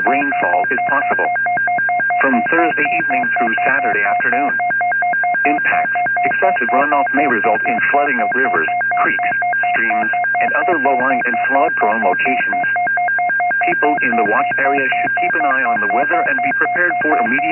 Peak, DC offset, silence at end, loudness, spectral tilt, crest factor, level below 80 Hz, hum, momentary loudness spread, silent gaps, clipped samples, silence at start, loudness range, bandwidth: -2 dBFS; under 0.1%; 0 s; -15 LUFS; -10 dB/octave; 14 dB; -76 dBFS; none; 2 LU; none; under 0.1%; 0 s; 0 LU; 3.1 kHz